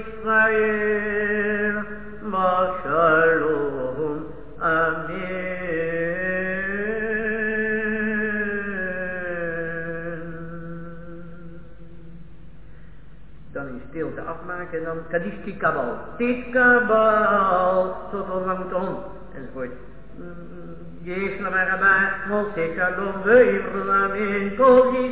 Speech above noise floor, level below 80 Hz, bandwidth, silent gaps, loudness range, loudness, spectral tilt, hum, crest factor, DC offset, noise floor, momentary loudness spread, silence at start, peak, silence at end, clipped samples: 25 dB; -48 dBFS; 4 kHz; none; 15 LU; -22 LUFS; -9.5 dB/octave; none; 20 dB; 1%; -45 dBFS; 19 LU; 0 s; -4 dBFS; 0 s; under 0.1%